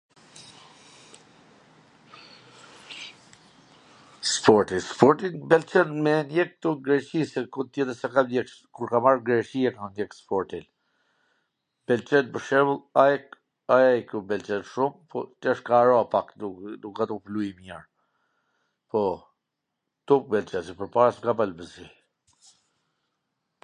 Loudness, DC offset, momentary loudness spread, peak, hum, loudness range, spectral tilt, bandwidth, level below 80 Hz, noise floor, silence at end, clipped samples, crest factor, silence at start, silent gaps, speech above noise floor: -24 LUFS; under 0.1%; 18 LU; 0 dBFS; none; 7 LU; -5 dB/octave; 10 kHz; -66 dBFS; -82 dBFS; 1.75 s; under 0.1%; 26 dB; 0.4 s; none; 58 dB